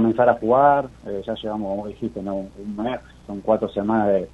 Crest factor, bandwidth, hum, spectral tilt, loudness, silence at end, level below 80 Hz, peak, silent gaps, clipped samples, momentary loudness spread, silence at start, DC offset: 20 dB; 8.4 kHz; none; -8 dB/octave; -22 LUFS; 0.05 s; -50 dBFS; -2 dBFS; none; under 0.1%; 14 LU; 0 s; under 0.1%